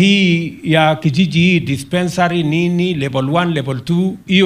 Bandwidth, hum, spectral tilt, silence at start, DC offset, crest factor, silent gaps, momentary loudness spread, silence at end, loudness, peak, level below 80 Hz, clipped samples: 12.5 kHz; none; -6 dB/octave; 0 s; under 0.1%; 14 dB; none; 5 LU; 0 s; -15 LUFS; 0 dBFS; -48 dBFS; under 0.1%